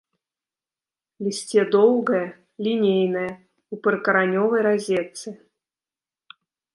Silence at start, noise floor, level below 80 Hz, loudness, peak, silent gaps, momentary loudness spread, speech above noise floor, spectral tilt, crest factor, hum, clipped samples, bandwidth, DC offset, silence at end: 1.2 s; under -90 dBFS; -72 dBFS; -21 LUFS; -6 dBFS; none; 16 LU; over 69 dB; -5.5 dB/octave; 18 dB; none; under 0.1%; 11.5 kHz; under 0.1%; 1.4 s